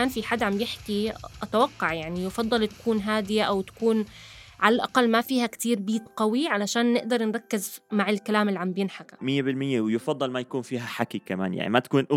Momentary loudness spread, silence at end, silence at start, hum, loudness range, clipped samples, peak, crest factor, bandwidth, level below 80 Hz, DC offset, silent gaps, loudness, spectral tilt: 8 LU; 0 s; 0 s; none; 3 LU; under 0.1%; -4 dBFS; 22 dB; 16.5 kHz; -58 dBFS; under 0.1%; none; -26 LUFS; -5 dB/octave